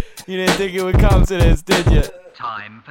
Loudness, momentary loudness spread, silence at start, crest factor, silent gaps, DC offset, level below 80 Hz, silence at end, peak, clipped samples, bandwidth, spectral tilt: -16 LUFS; 14 LU; 0 s; 16 dB; none; under 0.1%; -18 dBFS; 0.15 s; 0 dBFS; under 0.1%; 16.5 kHz; -5.5 dB/octave